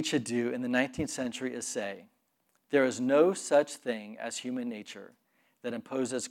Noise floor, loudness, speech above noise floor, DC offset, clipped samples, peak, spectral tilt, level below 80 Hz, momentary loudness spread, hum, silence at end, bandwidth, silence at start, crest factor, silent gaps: -75 dBFS; -31 LUFS; 44 dB; under 0.1%; under 0.1%; -12 dBFS; -4 dB/octave; -68 dBFS; 14 LU; none; 0 s; 16 kHz; 0 s; 20 dB; none